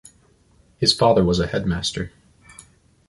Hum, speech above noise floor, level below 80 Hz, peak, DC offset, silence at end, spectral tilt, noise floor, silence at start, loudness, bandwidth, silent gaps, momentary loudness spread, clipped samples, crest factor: none; 38 dB; -42 dBFS; -4 dBFS; under 0.1%; 1 s; -5 dB/octave; -57 dBFS; 0.8 s; -20 LUFS; 11.5 kHz; none; 13 LU; under 0.1%; 20 dB